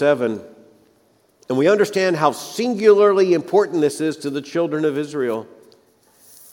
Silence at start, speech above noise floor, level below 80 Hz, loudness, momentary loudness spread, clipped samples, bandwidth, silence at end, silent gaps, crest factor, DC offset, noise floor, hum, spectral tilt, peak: 0 s; 41 dB; -72 dBFS; -18 LUFS; 11 LU; under 0.1%; 17 kHz; 1.1 s; none; 18 dB; under 0.1%; -58 dBFS; none; -5.5 dB/octave; -2 dBFS